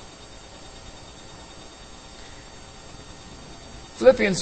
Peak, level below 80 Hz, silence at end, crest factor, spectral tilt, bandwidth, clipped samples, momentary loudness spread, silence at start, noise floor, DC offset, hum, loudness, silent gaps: -2 dBFS; -48 dBFS; 0 s; 24 dB; -4.5 dB/octave; 8.8 kHz; under 0.1%; 25 LU; 0.75 s; -44 dBFS; under 0.1%; none; -18 LUFS; none